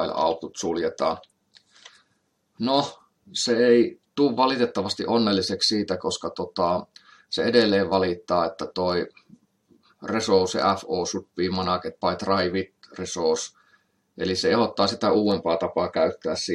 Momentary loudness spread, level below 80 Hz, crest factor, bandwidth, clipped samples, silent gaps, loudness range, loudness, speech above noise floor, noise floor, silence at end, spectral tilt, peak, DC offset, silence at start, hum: 9 LU; -66 dBFS; 20 dB; 11.5 kHz; under 0.1%; none; 4 LU; -24 LUFS; 47 dB; -71 dBFS; 0 s; -4.5 dB/octave; -4 dBFS; under 0.1%; 0 s; none